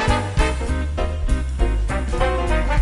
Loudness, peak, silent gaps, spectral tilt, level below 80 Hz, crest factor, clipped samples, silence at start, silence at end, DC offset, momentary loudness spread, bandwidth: -22 LUFS; -2 dBFS; none; -6 dB/octave; -22 dBFS; 16 dB; under 0.1%; 0 s; 0 s; under 0.1%; 4 LU; 11.5 kHz